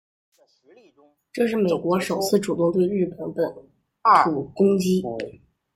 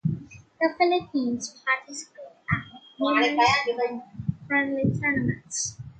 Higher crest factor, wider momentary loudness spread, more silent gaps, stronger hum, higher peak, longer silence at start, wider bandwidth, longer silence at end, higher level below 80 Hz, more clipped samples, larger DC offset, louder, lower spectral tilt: about the same, 20 dB vs 18 dB; second, 11 LU vs 15 LU; neither; neither; first, -4 dBFS vs -8 dBFS; first, 1.35 s vs 0.05 s; first, 15.5 kHz vs 9.4 kHz; first, 0.45 s vs 0.05 s; second, -62 dBFS vs -54 dBFS; neither; neither; first, -22 LUFS vs -25 LUFS; first, -6 dB/octave vs -4.5 dB/octave